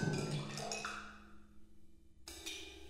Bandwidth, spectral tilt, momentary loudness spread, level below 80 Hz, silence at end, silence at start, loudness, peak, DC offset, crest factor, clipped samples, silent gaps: 16 kHz; -4 dB/octave; 19 LU; -64 dBFS; 0 s; 0 s; -43 LUFS; -24 dBFS; under 0.1%; 20 dB; under 0.1%; none